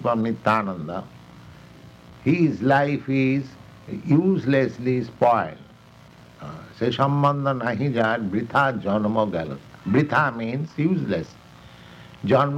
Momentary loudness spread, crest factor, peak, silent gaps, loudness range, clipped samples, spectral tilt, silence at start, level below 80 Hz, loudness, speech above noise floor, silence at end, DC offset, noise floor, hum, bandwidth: 14 LU; 18 dB; -4 dBFS; none; 2 LU; under 0.1%; -8 dB/octave; 0 s; -58 dBFS; -22 LUFS; 27 dB; 0 s; under 0.1%; -48 dBFS; none; 8.6 kHz